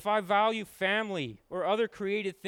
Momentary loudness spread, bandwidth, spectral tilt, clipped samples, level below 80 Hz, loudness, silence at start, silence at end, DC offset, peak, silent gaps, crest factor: 8 LU; 17.5 kHz; -5 dB/octave; under 0.1%; -70 dBFS; -30 LUFS; 0 s; 0 s; under 0.1%; -14 dBFS; none; 16 dB